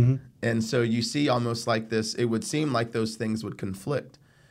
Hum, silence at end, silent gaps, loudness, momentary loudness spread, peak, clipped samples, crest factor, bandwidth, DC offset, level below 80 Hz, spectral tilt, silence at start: none; 0.4 s; none; -27 LUFS; 7 LU; -12 dBFS; under 0.1%; 16 dB; 15.5 kHz; under 0.1%; -60 dBFS; -5.5 dB/octave; 0 s